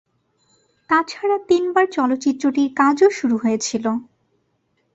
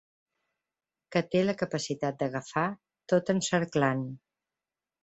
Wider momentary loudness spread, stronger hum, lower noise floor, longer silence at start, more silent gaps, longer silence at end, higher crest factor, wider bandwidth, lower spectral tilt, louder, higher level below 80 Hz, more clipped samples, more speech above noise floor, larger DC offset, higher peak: about the same, 6 LU vs 8 LU; neither; second, -67 dBFS vs under -90 dBFS; second, 0.9 s vs 1.1 s; neither; about the same, 0.9 s vs 0.85 s; about the same, 16 dB vs 20 dB; about the same, 8 kHz vs 8.2 kHz; second, -4 dB/octave vs -5.5 dB/octave; first, -19 LUFS vs -29 LUFS; about the same, -64 dBFS vs -68 dBFS; neither; second, 49 dB vs over 61 dB; neither; first, -4 dBFS vs -10 dBFS